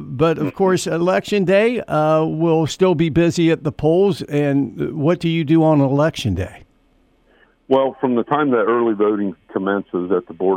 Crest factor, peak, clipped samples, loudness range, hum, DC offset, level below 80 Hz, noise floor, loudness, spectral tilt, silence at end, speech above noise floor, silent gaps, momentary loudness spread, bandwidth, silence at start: 16 dB; -2 dBFS; under 0.1%; 3 LU; none; under 0.1%; -48 dBFS; -57 dBFS; -18 LUFS; -7 dB/octave; 0 s; 40 dB; none; 7 LU; 13.5 kHz; 0 s